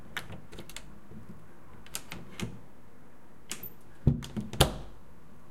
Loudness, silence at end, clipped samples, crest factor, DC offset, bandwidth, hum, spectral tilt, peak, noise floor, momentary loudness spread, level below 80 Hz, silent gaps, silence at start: -34 LUFS; 0 s; under 0.1%; 36 dB; 0.9%; 16.5 kHz; none; -4.5 dB/octave; 0 dBFS; -56 dBFS; 27 LU; -46 dBFS; none; 0 s